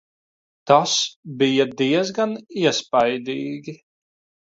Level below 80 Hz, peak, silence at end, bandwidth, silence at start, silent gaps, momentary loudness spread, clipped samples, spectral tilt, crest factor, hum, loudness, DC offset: -66 dBFS; 0 dBFS; 0.75 s; 8 kHz; 0.65 s; 1.16-1.23 s; 13 LU; under 0.1%; -3.5 dB/octave; 22 dB; none; -20 LUFS; under 0.1%